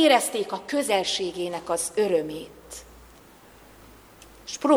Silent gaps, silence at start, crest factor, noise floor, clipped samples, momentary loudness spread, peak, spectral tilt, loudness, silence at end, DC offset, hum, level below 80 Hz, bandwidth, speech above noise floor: none; 0 s; 20 dB; -51 dBFS; under 0.1%; 19 LU; -6 dBFS; -2.5 dB/octave; -25 LUFS; 0 s; under 0.1%; none; -58 dBFS; over 20 kHz; 27 dB